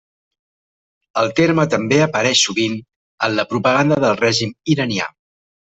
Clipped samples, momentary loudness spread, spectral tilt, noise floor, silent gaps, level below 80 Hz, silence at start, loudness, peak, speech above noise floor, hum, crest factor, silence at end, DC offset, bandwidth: under 0.1%; 8 LU; -4 dB/octave; under -90 dBFS; 2.96-3.18 s; -56 dBFS; 1.15 s; -17 LUFS; -2 dBFS; over 73 dB; none; 16 dB; 0.65 s; under 0.1%; 8.4 kHz